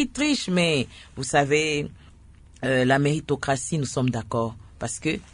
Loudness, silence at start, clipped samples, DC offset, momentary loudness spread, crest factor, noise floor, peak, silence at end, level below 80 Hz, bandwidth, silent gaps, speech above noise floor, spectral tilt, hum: -24 LUFS; 0 s; under 0.1%; under 0.1%; 11 LU; 18 dB; -49 dBFS; -6 dBFS; 0.1 s; -50 dBFS; 10.5 kHz; none; 25 dB; -4.5 dB/octave; none